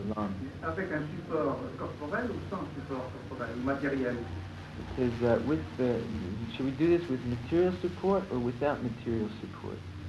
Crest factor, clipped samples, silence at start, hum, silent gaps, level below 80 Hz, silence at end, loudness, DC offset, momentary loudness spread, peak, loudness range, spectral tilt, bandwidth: 18 dB; under 0.1%; 0 s; none; none; -54 dBFS; 0 s; -33 LUFS; under 0.1%; 11 LU; -14 dBFS; 5 LU; -8 dB/octave; 11.5 kHz